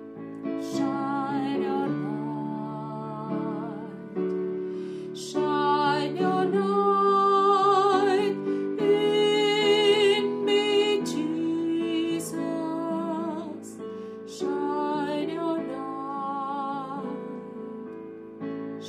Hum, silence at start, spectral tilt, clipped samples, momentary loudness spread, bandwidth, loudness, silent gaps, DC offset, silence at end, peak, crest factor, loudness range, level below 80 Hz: none; 0 s; -5 dB/octave; under 0.1%; 16 LU; 14 kHz; -26 LUFS; none; under 0.1%; 0 s; -10 dBFS; 16 dB; 9 LU; -74 dBFS